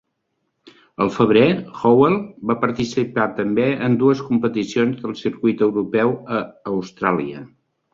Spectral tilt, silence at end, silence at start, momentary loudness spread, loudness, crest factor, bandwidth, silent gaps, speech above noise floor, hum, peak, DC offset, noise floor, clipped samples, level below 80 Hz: -7 dB/octave; 0.45 s; 1 s; 11 LU; -19 LUFS; 18 dB; 7.6 kHz; none; 54 dB; none; -2 dBFS; under 0.1%; -73 dBFS; under 0.1%; -56 dBFS